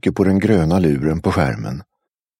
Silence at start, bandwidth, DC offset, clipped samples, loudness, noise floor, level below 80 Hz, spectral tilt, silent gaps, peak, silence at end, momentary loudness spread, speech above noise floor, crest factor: 0.05 s; 12.5 kHz; under 0.1%; under 0.1%; -17 LUFS; -78 dBFS; -38 dBFS; -8 dB/octave; none; -2 dBFS; 0.55 s; 12 LU; 62 dB; 16 dB